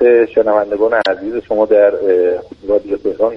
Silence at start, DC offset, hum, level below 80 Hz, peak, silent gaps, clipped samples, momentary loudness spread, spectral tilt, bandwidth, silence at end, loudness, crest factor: 0 s; under 0.1%; none; -48 dBFS; 0 dBFS; none; under 0.1%; 8 LU; -6.5 dB/octave; 5.8 kHz; 0 s; -14 LUFS; 12 dB